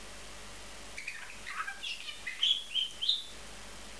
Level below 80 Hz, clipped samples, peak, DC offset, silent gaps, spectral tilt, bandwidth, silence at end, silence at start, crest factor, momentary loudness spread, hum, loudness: -60 dBFS; under 0.1%; -16 dBFS; 0.4%; none; 0 dB/octave; 11 kHz; 0 s; 0 s; 22 dB; 18 LU; none; -33 LUFS